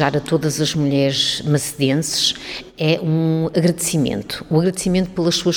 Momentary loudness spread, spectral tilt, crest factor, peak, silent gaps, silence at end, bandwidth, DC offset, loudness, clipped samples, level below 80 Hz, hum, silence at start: 3 LU; -4.5 dB/octave; 16 dB; -2 dBFS; none; 0 s; 18.5 kHz; under 0.1%; -18 LUFS; under 0.1%; -46 dBFS; none; 0 s